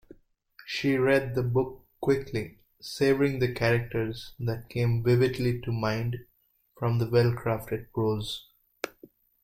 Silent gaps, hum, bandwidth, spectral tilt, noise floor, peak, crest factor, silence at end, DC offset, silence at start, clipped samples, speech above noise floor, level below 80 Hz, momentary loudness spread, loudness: none; none; 15.5 kHz; -7 dB/octave; -62 dBFS; -10 dBFS; 18 dB; 0.55 s; under 0.1%; 0.6 s; under 0.1%; 35 dB; -52 dBFS; 15 LU; -28 LUFS